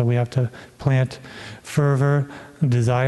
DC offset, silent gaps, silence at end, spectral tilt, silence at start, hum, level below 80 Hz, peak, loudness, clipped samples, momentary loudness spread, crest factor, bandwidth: under 0.1%; none; 0 s; -7.5 dB/octave; 0 s; none; -52 dBFS; -4 dBFS; -22 LUFS; under 0.1%; 15 LU; 16 dB; 12 kHz